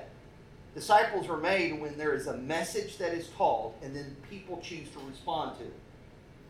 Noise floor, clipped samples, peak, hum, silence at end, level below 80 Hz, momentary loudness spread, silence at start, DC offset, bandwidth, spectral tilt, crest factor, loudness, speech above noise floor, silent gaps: -53 dBFS; under 0.1%; -10 dBFS; none; 0 s; -60 dBFS; 20 LU; 0 s; under 0.1%; 15.5 kHz; -4 dB/octave; 22 dB; -32 LUFS; 21 dB; none